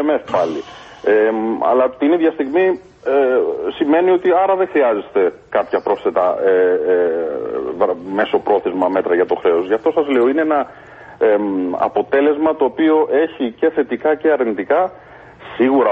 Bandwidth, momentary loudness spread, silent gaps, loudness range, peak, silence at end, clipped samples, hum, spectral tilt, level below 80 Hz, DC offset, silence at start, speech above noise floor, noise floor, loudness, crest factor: 6.6 kHz; 6 LU; none; 2 LU; -2 dBFS; 0 s; under 0.1%; none; -7 dB/octave; -56 dBFS; under 0.1%; 0 s; 21 dB; -37 dBFS; -16 LUFS; 14 dB